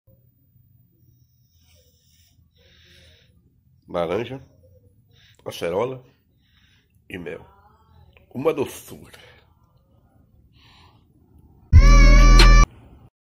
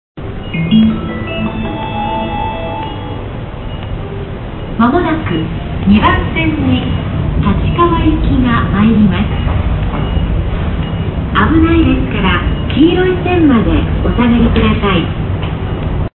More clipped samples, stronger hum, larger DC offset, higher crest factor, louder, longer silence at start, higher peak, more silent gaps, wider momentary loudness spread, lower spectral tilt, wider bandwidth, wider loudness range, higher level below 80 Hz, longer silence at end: neither; neither; neither; first, 20 dB vs 12 dB; second, -19 LUFS vs -13 LUFS; first, 3.95 s vs 0.15 s; about the same, 0 dBFS vs 0 dBFS; neither; first, 26 LU vs 13 LU; second, -5 dB/octave vs -11.5 dB/octave; first, 11.5 kHz vs 4.2 kHz; first, 15 LU vs 6 LU; about the same, -22 dBFS vs -20 dBFS; first, 0.55 s vs 0.1 s